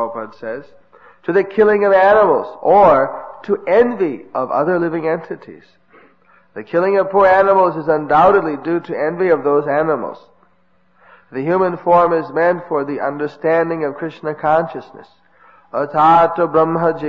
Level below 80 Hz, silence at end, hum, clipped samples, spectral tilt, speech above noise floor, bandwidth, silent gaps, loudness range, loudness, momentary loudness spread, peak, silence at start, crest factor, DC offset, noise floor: -52 dBFS; 0 s; none; under 0.1%; -8.5 dB/octave; 44 dB; 6.4 kHz; none; 6 LU; -15 LUFS; 15 LU; -2 dBFS; 0 s; 14 dB; 0.2%; -59 dBFS